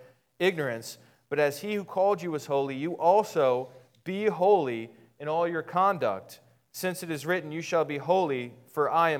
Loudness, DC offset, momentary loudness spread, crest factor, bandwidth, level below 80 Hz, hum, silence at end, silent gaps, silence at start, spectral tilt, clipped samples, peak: -28 LUFS; under 0.1%; 14 LU; 18 dB; 18 kHz; -82 dBFS; none; 0 s; none; 0 s; -5.5 dB/octave; under 0.1%; -10 dBFS